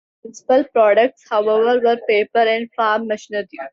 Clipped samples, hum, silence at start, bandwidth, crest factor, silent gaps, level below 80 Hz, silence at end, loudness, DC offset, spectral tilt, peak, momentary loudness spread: under 0.1%; none; 0.25 s; 7.6 kHz; 14 dB; none; -70 dBFS; 0.05 s; -17 LUFS; under 0.1%; -4 dB/octave; -4 dBFS; 10 LU